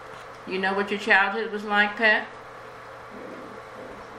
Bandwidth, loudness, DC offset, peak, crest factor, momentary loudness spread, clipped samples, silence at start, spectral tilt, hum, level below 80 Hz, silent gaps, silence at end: 15 kHz; -22 LUFS; under 0.1%; -4 dBFS; 22 dB; 22 LU; under 0.1%; 0 s; -4.5 dB/octave; none; -64 dBFS; none; 0 s